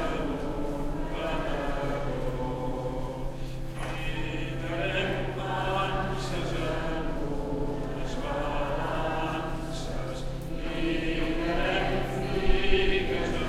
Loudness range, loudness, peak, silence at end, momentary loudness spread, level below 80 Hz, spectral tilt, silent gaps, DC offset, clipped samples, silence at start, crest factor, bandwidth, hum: 4 LU; -31 LUFS; -8 dBFS; 0 s; 8 LU; -34 dBFS; -6 dB/octave; none; under 0.1%; under 0.1%; 0 s; 20 dB; 12.5 kHz; none